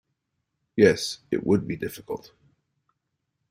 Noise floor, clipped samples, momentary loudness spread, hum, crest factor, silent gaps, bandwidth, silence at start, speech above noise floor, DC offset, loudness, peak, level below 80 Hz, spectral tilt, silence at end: -79 dBFS; under 0.1%; 16 LU; none; 24 dB; none; 16 kHz; 0.75 s; 55 dB; under 0.1%; -24 LUFS; -4 dBFS; -60 dBFS; -5.5 dB/octave; 1.35 s